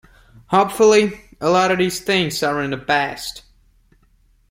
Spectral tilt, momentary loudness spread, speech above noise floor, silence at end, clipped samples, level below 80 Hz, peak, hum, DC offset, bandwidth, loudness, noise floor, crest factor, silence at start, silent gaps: -4 dB/octave; 11 LU; 39 dB; 1.1 s; under 0.1%; -52 dBFS; -2 dBFS; none; under 0.1%; 16.5 kHz; -18 LUFS; -57 dBFS; 18 dB; 0.5 s; none